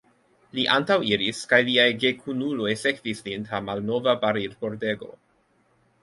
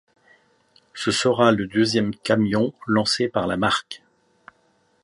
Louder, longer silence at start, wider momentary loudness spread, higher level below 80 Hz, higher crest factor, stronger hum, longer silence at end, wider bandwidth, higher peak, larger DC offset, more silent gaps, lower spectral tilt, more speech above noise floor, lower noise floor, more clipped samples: second, -24 LUFS vs -21 LUFS; second, 0.55 s vs 0.95 s; first, 12 LU vs 9 LU; second, -64 dBFS vs -56 dBFS; about the same, 22 dB vs 20 dB; neither; second, 0.9 s vs 1.05 s; about the same, 11.5 kHz vs 11.5 kHz; about the same, -4 dBFS vs -2 dBFS; neither; neither; about the same, -4.5 dB/octave vs -4.5 dB/octave; about the same, 41 dB vs 43 dB; about the same, -65 dBFS vs -64 dBFS; neither